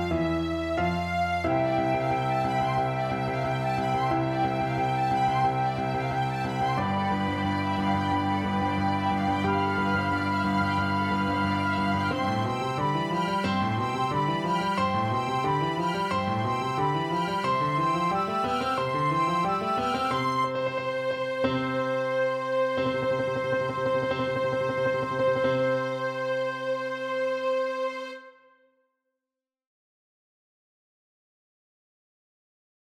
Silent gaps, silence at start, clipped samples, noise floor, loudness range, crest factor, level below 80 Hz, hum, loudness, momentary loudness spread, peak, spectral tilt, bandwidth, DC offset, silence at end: none; 0 s; under 0.1%; -90 dBFS; 2 LU; 14 dB; -52 dBFS; none; -27 LUFS; 3 LU; -14 dBFS; -6.5 dB/octave; 15 kHz; under 0.1%; 4.6 s